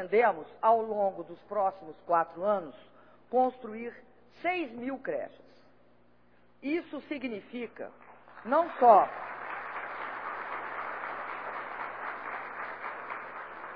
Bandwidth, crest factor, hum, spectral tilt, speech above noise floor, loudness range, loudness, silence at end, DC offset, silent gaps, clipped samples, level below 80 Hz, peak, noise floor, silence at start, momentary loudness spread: 5.2 kHz; 24 dB; 60 Hz at -65 dBFS; -8 dB/octave; 35 dB; 10 LU; -31 LUFS; 0 s; under 0.1%; none; under 0.1%; -74 dBFS; -8 dBFS; -65 dBFS; 0 s; 15 LU